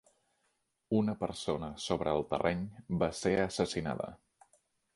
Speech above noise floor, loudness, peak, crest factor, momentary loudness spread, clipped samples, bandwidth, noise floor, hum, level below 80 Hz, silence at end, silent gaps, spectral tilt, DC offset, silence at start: 46 dB; -34 LUFS; -14 dBFS; 20 dB; 7 LU; under 0.1%; 11.5 kHz; -79 dBFS; none; -56 dBFS; 0.8 s; none; -5.5 dB/octave; under 0.1%; 0.9 s